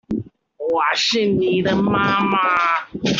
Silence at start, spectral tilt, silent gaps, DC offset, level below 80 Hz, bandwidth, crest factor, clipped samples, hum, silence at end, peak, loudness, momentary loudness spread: 0.1 s; -4.5 dB/octave; none; under 0.1%; -52 dBFS; 7.6 kHz; 16 dB; under 0.1%; none; 0 s; -4 dBFS; -18 LUFS; 8 LU